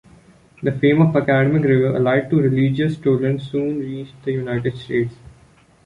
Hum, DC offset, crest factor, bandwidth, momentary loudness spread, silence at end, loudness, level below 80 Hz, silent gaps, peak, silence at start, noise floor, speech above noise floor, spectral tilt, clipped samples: none; under 0.1%; 16 dB; 9.8 kHz; 10 LU; 0.7 s; -19 LUFS; -52 dBFS; none; -4 dBFS; 0.6 s; -51 dBFS; 34 dB; -9 dB/octave; under 0.1%